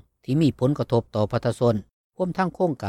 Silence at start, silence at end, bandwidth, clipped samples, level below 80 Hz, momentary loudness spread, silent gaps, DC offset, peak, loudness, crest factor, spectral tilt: 0.3 s; 0 s; 12.5 kHz; under 0.1%; -54 dBFS; 6 LU; 1.93-2.10 s; under 0.1%; -8 dBFS; -24 LUFS; 14 dB; -8 dB/octave